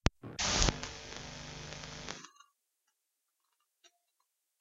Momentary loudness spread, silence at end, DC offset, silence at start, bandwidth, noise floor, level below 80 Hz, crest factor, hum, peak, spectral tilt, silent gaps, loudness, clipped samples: 16 LU; 0.75 s; under 0.1%; 0.05 s; 11 kHz; -84 dBFS; -46 dBFS; 34 dB; none; -6 dBFS; -2.5 dB/octave; none; -36 LUFS; under 0.1%